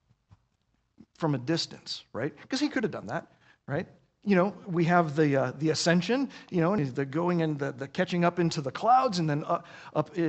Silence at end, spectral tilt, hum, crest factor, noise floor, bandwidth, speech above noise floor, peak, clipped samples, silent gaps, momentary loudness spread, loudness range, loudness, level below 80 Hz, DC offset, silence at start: 0 s; -6 dB/octave; none; 20 dB; -74 dBFS; 8.4 kHz; 46 dB; -8 dBFS; under 0.1%; none; 11 LU; 6 LU; -28 LUFS; -68 dBFS; under 0.1%; 1.2 s